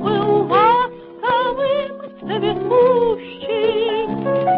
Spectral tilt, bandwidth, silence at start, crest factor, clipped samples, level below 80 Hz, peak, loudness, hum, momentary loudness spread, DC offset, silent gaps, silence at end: -11 dB/octave; 5.2 kHz; 0 s; 14 dB; under 0.1%; -50 dBFS; -4 dBFS; -18 LUFS; none; 11 LU; under 0.1%; none; 0 s